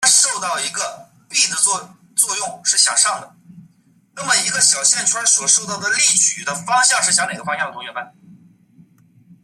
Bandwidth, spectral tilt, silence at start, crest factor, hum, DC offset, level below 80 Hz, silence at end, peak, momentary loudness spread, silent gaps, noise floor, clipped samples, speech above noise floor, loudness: 16 kHz; 1 dB/octave; 0 s; 20 dB; none; under 0.1%; -70 dBFS; 1.35 s; 0 dBFS; 12 LU; none; -55 dBFS; under 0.1%; 37 dB; -15 LUFS